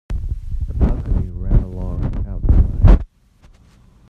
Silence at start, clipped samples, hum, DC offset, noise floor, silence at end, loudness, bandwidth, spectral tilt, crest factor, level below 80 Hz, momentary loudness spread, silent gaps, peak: 0.1 s; under 0.1%; none; under 0.1%; -49 dBFS; 1.05 s; -20 LUFS; 3.7 kHz; -10 dB/octave; 16 dB; -18 dBFS; 13 LU; none; 0 dBFS